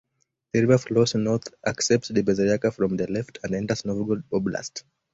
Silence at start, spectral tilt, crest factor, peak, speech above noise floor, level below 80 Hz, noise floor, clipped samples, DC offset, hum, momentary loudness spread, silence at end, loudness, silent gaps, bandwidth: 0.55 s; -5.5 dB/octave; 20 dB; -4 dBFS; 49 dB; -56 dBFS; -73 dBFS; under 0.1%; under 0.1%; none; 10 LU; 0.35 s; -24 LUFS; none; 8 kHz